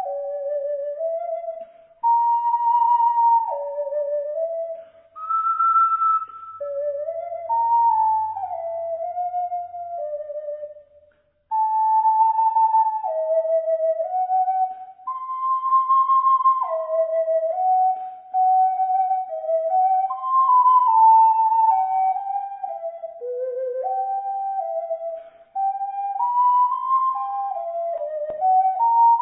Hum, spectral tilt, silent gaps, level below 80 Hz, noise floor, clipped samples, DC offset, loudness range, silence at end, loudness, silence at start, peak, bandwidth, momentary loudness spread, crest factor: none; -6 dB/octave; none; -76 dBFS; -59 dBFS; under 0.1%; under 0.1%; 8 LU; 0 s; -21 LUFS; 0 s; -8 dBFS; 3.4 kHz; 13 LU; 14 dB